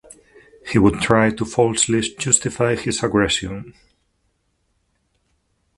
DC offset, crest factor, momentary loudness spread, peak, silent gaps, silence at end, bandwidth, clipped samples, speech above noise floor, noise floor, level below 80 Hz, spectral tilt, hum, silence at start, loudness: under 0.1%; 20 dB; 6 LU; 0 dBFS; none; 2.1 s; 11.5 kHz; under 0.1%; 49 dB; -68 dBFS; -44 dBFS; -4 dB/octave; none; 0.65 s; -18 LUFS